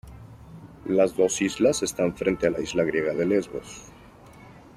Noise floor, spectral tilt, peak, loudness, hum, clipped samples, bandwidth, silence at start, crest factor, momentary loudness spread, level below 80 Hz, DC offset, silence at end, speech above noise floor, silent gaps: -48 dBFS; -4.5 dB/octave; -8 dBFS; -24 LUFS; none; under 0.1%; 14.5 kHz; 0.05 s; 18 dB; 22 LU; -52 dBFS; under 0.1%; 0.15 s; 24 dB; none